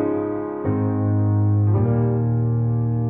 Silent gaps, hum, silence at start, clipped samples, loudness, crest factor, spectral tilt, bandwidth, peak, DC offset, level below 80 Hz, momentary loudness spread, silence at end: none; none; 0 s; under 0.1%; -21 LUFS; 10 dB; -14.5 dB/octave; 2.5 kHz; -10 dBFS; under 0.1%; -46 dBFS; 6 LU; 0 s